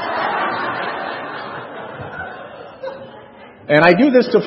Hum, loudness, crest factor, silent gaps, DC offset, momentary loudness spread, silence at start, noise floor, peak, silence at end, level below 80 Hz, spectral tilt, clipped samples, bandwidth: none; -16 LUFS; 18 dB; none; under 0.1%; 22 LU; 0 s; -40 dBFS; 0 dBFS; 0 s; -60 dBFS; -8 dB/octave; under 0.1%; 6 kHz